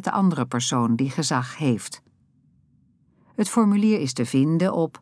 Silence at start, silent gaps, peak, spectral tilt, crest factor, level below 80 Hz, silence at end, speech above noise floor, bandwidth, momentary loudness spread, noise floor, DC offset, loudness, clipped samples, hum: 0 s; none; -6 dBFS; -5.5 dB/octave; 16 dB; -72 dBFS; 0.05 s; 39 dB; 11 kHz; 8 LU; -61 dBFS; under 0.1%; -22 LUFS; under 0.1%; none